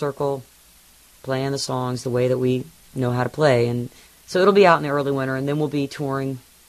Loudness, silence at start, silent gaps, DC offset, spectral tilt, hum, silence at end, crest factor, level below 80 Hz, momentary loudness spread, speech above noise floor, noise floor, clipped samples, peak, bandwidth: -21 LUFS; 0 s; none; under 0.1%; -6 dB/octave; none; 0.3 s; 20 dB; -58 dBFS; 13 LU; 31 dB; -52 dBFS; under 0.1%; -2 dBFS; 14 kHz